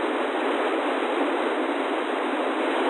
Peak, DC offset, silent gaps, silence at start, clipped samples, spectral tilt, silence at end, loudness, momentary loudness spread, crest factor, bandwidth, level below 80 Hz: -12 dBFS; under 0.1%; none; 0 s; under 0.1%; -2.5 dB/octave; 0 s; -25 LUFS; 2 LU; 12 dB; 10.5 kHz; -78 dBFS